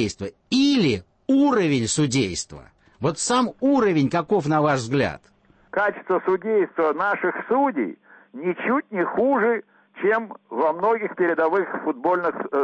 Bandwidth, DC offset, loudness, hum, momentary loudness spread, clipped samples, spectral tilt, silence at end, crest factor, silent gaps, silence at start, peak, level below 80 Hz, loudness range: 8.8 kHz; under 0.1%; -22 LUFS; none; 9 LU; under 0.1%; -5 dB/octave; 0 s; 12 dB; none; 0 s; -10 dBFS; -58 dBFS; 2 LU